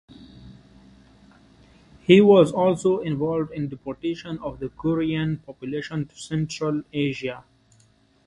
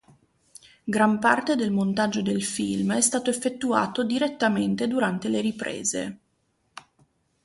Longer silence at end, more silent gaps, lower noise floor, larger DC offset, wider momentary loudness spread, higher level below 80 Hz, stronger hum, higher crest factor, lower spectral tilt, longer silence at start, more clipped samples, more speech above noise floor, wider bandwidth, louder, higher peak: first, 0.85 s vs 0.65 s; neither; second, -59 dBFS vs -71 dBFS; neither; first, 16 LU vs 6 LU; first, -56 dBFS vs -64 dBFS; neither; about the same, 22 dB vs 20 dB; first, -7 dB/octave vs -4 dB/octave; second, 0.2 s vs 0.85 s; neither; second, 37 dB vs 46 dB; about the same, 11 kHz vs 11.5 kHz; about the same, -23 LUFS vs -24 LUFS; about the same, -2 dBFS vs -4 dBFS